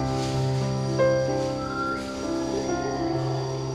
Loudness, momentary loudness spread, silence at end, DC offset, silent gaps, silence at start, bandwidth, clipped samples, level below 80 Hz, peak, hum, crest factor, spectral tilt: -26 LUFS; 6 LU; 0 s; under 0.1%; none; 0 s; 11.5 kHz; under 0.1%; -46 dBFS; -12 dBFS; none; 14 dB; -6 dB/octave